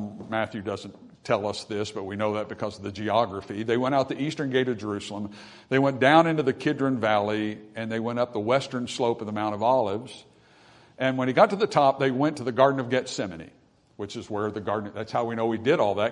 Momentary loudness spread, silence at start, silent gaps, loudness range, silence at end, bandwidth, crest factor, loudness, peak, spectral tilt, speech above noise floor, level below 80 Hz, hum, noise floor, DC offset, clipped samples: 14 LU; 0 s; none; 4 LU; 0 s; 10.5 kHz; 22 dB; -26 LUFS; -4 dBFS; -6 dB/octave; 30 dB; -68 dBFS; none; -55 dBFS; under 0.1%; under 0.1%